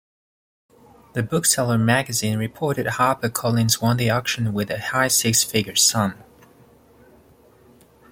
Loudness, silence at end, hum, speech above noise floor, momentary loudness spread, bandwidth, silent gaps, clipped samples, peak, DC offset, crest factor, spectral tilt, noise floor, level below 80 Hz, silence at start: -20 LUFS; 2 s; none; 32 dB; 8 LU; 16.5 kHz; none; under 0.1%; -4 dBFS; under 0.1%; 20 dB; -3.5 dB/octave; -53 dBFS; -56 dBFS; 1.15 s